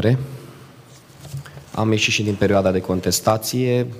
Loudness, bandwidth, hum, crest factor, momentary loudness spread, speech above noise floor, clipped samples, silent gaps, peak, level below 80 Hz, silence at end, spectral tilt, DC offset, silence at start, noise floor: -19 LUFS; 15.5 kHz; none; 18 dB; 18 LU; 26 dB; under 0.1%; none; -2 dBFS; -52 dBFS; 0 s; -5 dB/octave; under 0.1%; 0 s; -45 dBFS